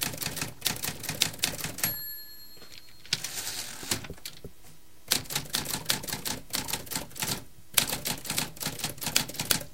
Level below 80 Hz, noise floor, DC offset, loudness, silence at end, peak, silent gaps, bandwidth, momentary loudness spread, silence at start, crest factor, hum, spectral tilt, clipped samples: -54 dBFS; -55 dBFS; 0.6%; -30 LUFS; 0 s; 0 dBFS; none; 17 kHz; 15 LU; 0 s; 34 dB; none; -1.5 dB/octave; under 0.1%